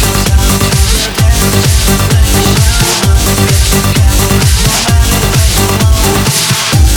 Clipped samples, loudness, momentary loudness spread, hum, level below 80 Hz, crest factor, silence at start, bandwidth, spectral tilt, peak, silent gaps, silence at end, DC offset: 0.2%; -8 LUFS; 1 LU; none; -12 dBFS; 8 dB; 0 s; 20 kHz; -4 dB/octave; 0 dBFS; none; 0 s; under 0.1%